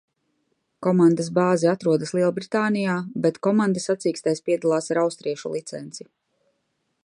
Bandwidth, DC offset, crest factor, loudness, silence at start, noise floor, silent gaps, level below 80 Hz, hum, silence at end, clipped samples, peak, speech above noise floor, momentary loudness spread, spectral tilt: 11 kHz; under 0.1%; 16 dB; -22 LUFS; 0.8 s; -74 dBFS; none; -72 dBFS; none; 1.05 s; under 0.1%; -6 dBFS; 52 dB; 11 LU; -6 dB/octave